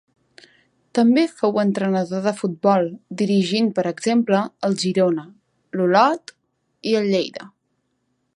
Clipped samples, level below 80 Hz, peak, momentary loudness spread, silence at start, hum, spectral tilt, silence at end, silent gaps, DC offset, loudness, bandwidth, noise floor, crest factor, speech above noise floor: under 0.1%; -70 dBFS; -2 dBFS; 10 LU; 0.95 s; none; -6 dB/octave; 0.85 s; none; under 0.1%; -20 LUFS; 11 kHz; -71 dBFS; 18 dB; 52 dB